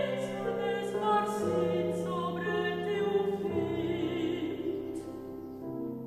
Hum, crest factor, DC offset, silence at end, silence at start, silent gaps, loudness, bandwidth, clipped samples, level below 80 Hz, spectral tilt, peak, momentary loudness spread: none; 14 dB; under 0.1%; 0 s; 0 s; none; -32 LUFS; 13.5 kHz; under 0.1%; -62 dBFS; -6.5 dB/octave; -18 dBFS; 11 LU